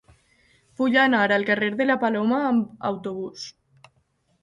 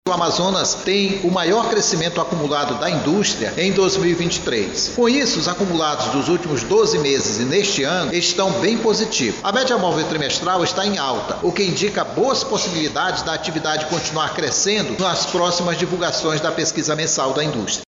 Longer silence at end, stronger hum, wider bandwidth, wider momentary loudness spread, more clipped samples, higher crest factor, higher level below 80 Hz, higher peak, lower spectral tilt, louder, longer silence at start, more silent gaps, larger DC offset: first, 0.9 s vs 0.05 s; neither; about the same, 7.6 kHz vs 8 kHz; first, 15 LU vs 4 LU; neither; about the same, 18 dB vs 14 dB; second, -66 dBFS vs -48 dBFS; about the same, -6 dBFS vs -4 dBFS; first, -5.5 dB/octave vs -3 dB/octave; second, -22 LUFS vs -18 LUFS; first, 0.8 s vs 0.05 s; neither; neither